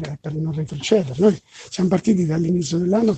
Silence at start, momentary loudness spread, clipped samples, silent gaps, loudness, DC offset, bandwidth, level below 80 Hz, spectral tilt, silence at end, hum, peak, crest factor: 0 s; 9 LU; under 0.1%; none; -20 LUFS; under 0.1%; 8.8 kHz; -52 dBFS; -6.5 dB/octave; 0 s; none; -2 dBFS; 16 dB